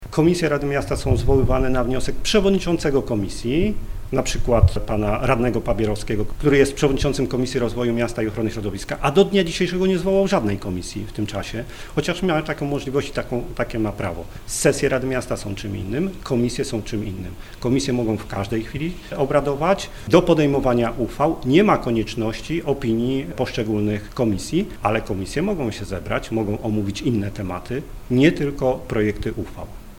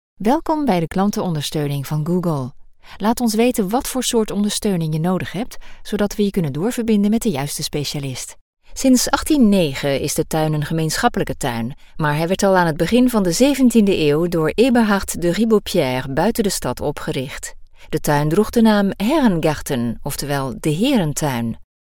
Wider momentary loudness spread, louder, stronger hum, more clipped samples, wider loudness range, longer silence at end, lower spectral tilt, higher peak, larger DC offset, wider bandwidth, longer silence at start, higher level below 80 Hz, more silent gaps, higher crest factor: about the same, 10 LU vs 10 LU; second, -22 LUFS vs -18 LUFS; neither; neither; about the same, 5 LU vs 5 LU; second, 0 s vs 0.3 s; about the same, -6 dB/octave vs -5 dB/octave; about the same, 0 dBFS vs 0 dBFS; neither; second, 16.5 kHz vs 18.5 kHz; second, 0 s vs 0.2 s; first, -32 dBFS vs -38 dBFS; second, none vs 8.41-8.57 s; about the same, 20 dB vs 18 dB